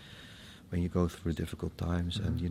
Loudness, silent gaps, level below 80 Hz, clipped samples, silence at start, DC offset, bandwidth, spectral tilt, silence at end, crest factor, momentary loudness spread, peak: -34 LUFS; none; -50 dBFS; under 0.1%; 0 s; under 0.1%; 15 kHz; -7 dB/octave; 0 s; 18 dB; 17 LU; -16 dBFS